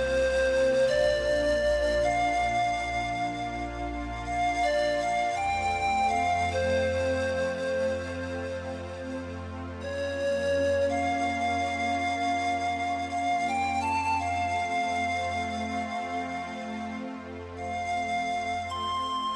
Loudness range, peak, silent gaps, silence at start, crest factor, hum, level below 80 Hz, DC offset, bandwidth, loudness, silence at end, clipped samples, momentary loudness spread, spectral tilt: 5 LU; -14 dBFS; none; 0 s; 14 dB; none; -46 dBFS; under 0.1%; 11 kHz; -28 LUFS; 0 s; under 0.1%; 10 LU; -4.5 dB/octave